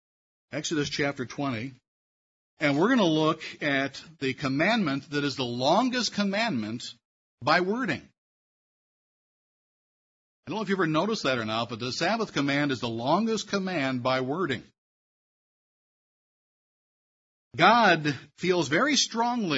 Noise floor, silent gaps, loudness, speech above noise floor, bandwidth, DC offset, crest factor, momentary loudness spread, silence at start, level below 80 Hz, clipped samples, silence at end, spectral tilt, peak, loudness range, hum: under -90 dBFS; 1.88-2.57 s, 7.05-7.38 s, 8.18-10.43 s, 14.78-17.51 s; -26 LUFS; over 64 dB; 8 kHz; under 0.1%; 22 dB; 11 LU; 0.5 s; -68 dBFS; under 0.1%; 0 s; -4.5 dB/octave; -6 dBFS; 7 LU; none